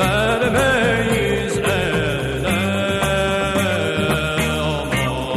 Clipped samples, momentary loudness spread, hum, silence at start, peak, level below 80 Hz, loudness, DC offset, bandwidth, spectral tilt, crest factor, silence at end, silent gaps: under 0.1%; 4 LU; none; 0 s; -4 dBFS; -34 dBFS; -18 LUFS; under 0.1%; 15.5 kHz; -5 dB/octave; 14 dB; 0 s; none